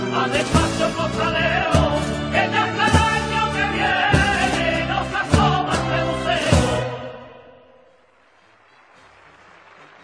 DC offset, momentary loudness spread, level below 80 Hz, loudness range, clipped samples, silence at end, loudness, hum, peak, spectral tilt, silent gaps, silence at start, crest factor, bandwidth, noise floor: under 0.1%; 5 LU; -34 dBFS; 6 LU; under 0.1%; 2.55 s; -19 LUFS; none; 0 dBFS; -5 dB/octave; none; 0 s; 20 dB; 11 kHz; -55 dBFS